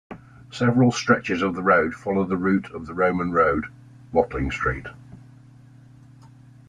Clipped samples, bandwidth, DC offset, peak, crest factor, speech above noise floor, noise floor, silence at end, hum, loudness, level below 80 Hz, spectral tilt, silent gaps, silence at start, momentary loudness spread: under 0.1%; 10 kHz; under 0.1%; -4 dBFS; 20 dB; 27 dB; -48 dBFS; 0.4 s; none; -22 LUFS; -46 dBFS; -6.5 dB/octave; none; 0.1 s; 16 LU